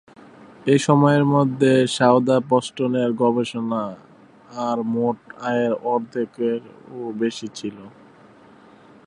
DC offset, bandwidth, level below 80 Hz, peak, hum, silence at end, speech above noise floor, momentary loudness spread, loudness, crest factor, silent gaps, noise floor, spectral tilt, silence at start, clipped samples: under 0.1%; 11 kHz; -66 dBFS; -2 dBFS; none; 1.15 s; 29 dB; 15 LU; -20 LUFS; 20 dB; none; -49 dBFS; -6.5 dB/octave; 0.65 s; under 0.1%